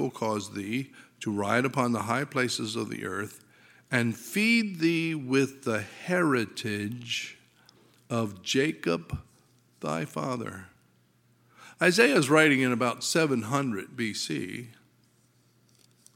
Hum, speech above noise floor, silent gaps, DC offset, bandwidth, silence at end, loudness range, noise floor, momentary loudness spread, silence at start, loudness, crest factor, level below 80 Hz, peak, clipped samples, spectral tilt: none; 37 dB; none; under 0.1%; 17 kHz; 1.45 s; 7 LU; -65 dBFS; 13 LU; 0 s; -28 LUFS; 24 dB; -62 dBFS; -4 dBFS; under 0.1%; -4.5 dB/octave